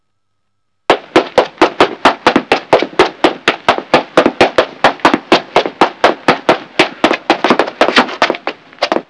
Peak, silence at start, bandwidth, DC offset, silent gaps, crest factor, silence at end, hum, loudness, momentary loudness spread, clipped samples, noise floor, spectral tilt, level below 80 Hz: 0 dBFS; 0.9 s; 11 kHz; 0.1%; none; 12 dB; 0.05 s; none; -12 LUFS; 4 LU; 2%; -71 dBFS; -4 dB/octave; -48 dBFS